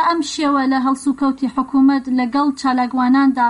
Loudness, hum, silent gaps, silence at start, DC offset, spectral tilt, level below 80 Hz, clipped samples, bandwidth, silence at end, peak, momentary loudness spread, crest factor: -17 LUFS; none; none; 0 s; under 0.1%; -3.5 dB/octave; -54 dBFS; under 0.1%; 11 kHz; 0 s; -6 dBFS; 4 LU; 10 dB